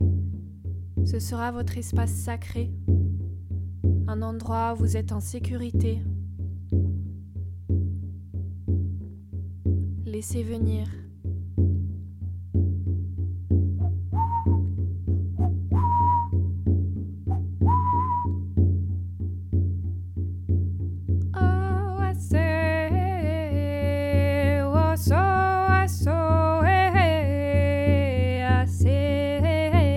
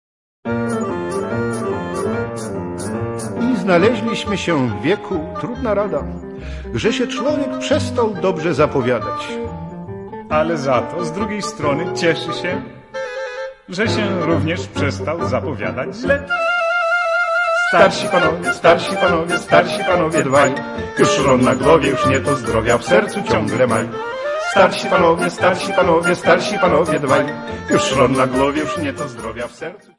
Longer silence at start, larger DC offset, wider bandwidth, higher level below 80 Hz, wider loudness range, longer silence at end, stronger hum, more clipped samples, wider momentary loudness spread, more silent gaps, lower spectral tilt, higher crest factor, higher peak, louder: second, 0 s vs 0.45 s; neither; first, 13 kHz vs 11.5 kHz; first, -38 dBFS vs -44 dBFS; about the same, 8 LU vs 6 LU; second, 0 s vs 0.2 s; neither; neither; about the same, 12 LU vs 12 LU; neither; first, -7.5 dB/octave vs -5 dB/octave; about the same, 16 dB vs 18 dB; second, -8 dBFS vs 0 dBFS; second, -25 LUFS vs -17 LUFS